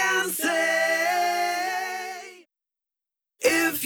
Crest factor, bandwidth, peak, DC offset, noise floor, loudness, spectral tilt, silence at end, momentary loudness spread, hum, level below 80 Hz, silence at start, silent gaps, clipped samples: 18 dB; over 20 kHz; -8 dBFS; under 0.1%; -89 dBFS; -24 LUFS; -1 dB/octave; 0 s; 13 LU; none; -70 dBFS; 0 s; none; under 0.1%